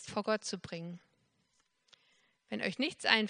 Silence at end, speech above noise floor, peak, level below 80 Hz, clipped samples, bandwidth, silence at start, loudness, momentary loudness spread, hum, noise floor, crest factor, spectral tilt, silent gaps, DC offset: 0 s; 42 dB; -8 dBFS; -78 dBFS; under 0.1%; 10 kHz; 0 s; -36 LUFS; 13 LU; none; -76 dBFS; 30 dB; -3.5 dB/octave; none; under 0.1%